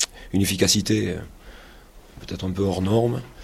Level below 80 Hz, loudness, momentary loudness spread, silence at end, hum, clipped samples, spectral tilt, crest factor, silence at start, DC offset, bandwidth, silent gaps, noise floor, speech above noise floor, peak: -46 dBFS; -22 LUFS; 16 LU; 0 s; none; under 0.1%; -4.5 dB/octave; 22 dB; 0 s; under 0.1%; 15.5 kHz; none; -47 dBFS; 24 dB; -2 dBFS